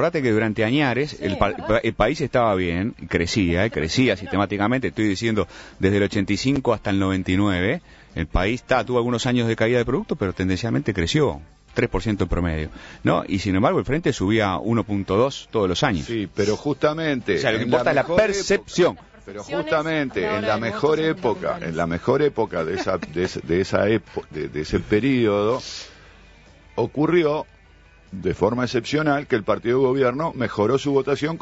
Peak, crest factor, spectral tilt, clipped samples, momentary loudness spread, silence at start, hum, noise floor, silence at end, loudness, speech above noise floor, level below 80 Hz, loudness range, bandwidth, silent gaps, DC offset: -2 dBFS; 18 dB; -6 dB/octave; under 0.1%; 7 LU; 0 s; none; -51 dBFS; 0.05 s; -22 LUFS; 29 dB; -40 dBFS; 2 LU; 8 kHz; none; under 0.1%